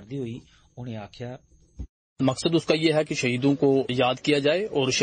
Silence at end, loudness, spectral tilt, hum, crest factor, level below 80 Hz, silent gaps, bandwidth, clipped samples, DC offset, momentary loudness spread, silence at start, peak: 0 s; -23 LUFS; -5 dB/octave; none; 16 dB; -52 dBFS; 1.89-2.16 s; 9.4 kHz; under 0.1%; under 0.1%; 21 LU; 0 s; -8 dBFS